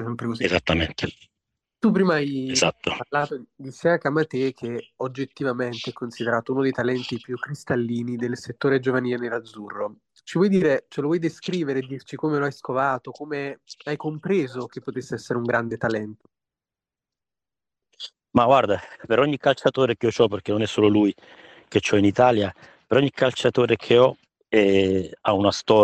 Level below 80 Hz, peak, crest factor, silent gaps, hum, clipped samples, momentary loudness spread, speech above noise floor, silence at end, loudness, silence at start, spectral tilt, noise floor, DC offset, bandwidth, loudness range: -58 dBFS; -4 dBFS; 18 dB; none; none; under 0.1%; 13 LU; over 68 dB; 0 s; -23 LUFS; 0 s; -5.5 dB/octave; under -90 dBFS; under 0.1%; 10 kHz; 7 LU